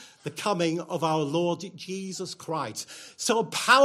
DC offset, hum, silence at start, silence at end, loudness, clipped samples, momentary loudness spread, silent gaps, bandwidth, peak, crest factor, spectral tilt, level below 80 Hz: under 0.1%; none; 0 s; 0 s; -28 LUFS; under 0.1%; 10 LU; none; 15.5 kHz; -6 dBFS; 20 dB; -3.5 dB/octave; -74 dBFS